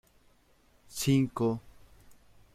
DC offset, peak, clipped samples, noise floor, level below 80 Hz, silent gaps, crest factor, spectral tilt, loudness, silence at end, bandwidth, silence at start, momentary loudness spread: under 0.1%; -14 dBFS; under 0.1%; -65 dBFS; -60 dBFS; none; 20 dB; -6 dB/octave; -30 LUFS; 0.4 s; 16 kHz; 0.9 s; 13 LU